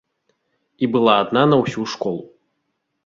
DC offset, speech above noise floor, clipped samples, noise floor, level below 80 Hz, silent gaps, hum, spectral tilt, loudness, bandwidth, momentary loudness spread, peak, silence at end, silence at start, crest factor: under 0.1%; 56 dB; under 0.1%; -73 dBFS; -60 dBFS; none; none; -6 dB/octave; -18 LUFS; 7.6 kHz; 10 LU; -2 dBFS; 0.8 s; 0.8 s; 20 dB